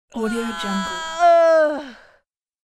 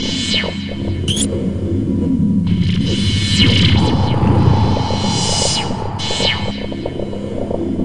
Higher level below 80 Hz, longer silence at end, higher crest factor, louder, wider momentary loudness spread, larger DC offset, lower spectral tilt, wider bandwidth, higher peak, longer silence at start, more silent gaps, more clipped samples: second, -52 dBFS vs -32 dBFS; first, 0.7 s vs 0 s; about the same, 14 dB vs 16 dB; about the same, -18 LUFS vs -16 LUFS; first, 13 LU vs 10 LU; second, under 0.1% vs 3%; about the same, -4.5 dB/octave vs -5 dB/octave; about the same, 12.5 kHz vs 11.5 kHz; second, -6 dBFS vs 0 dBFS; first, 0.15 s vs 0 s; neither; neither